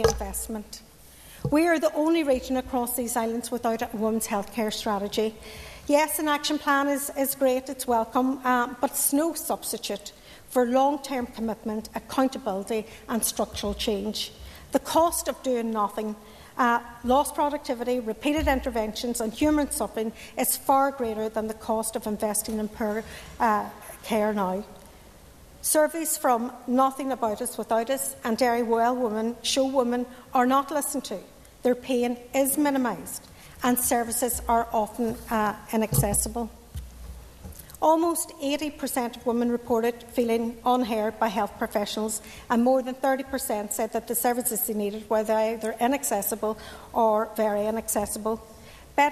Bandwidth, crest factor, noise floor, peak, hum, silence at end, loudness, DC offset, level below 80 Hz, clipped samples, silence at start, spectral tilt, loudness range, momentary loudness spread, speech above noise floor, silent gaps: 14 kHz; 20 dB; -49 dBFS; -6 dBFS; none; 0 s; -26 LUFS; under 0.1%; -48 dBFS; under 0.1%; 0 s; -3.5 dB/octave; 3 LU; 9 LU; 24 dB; none